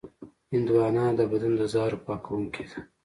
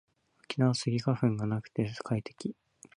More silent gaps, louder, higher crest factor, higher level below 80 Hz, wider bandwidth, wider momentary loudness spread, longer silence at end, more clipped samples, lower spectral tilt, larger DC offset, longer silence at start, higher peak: neither; first, -27 LUFS vs -32 LUFS; about the same, 16 dB vs 20 dB; first, -58 dBFS vs -64 dBFS; about the same, 11.5 kHz vs 10.5 kHz; about the same, 11 LU vs 12 LU; second, 0.2 s vs 0.45 s; neither; first, -8 dB/octave vs -6.5 dB/octave; neither; second, 0.05 s vs 0.5 s; about the same, -12 dBFS vs -12 dBFS